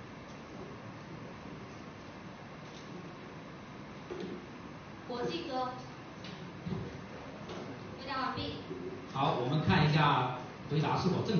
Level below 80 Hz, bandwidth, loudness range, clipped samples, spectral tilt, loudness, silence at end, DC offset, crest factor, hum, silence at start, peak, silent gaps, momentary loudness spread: -60 dBFS; 6.6 kHz; 15 LU; under 0.1%; -5 dB/octave; -36 LUFS; 0 s; under 0.1%; 22 dB; none; 0 s; -14 dBFS; none; 18 LU